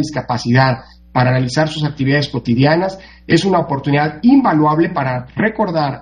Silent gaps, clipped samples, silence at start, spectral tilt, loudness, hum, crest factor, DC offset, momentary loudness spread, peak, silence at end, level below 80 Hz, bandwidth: none; under 0.1%; 0 s; -6.5 dB/octave; -15 LUFS; none; 14 dB; under 0.1%; 8 LU; 0 dBFS; 0 s; -44 dBFS; 9.8 kHz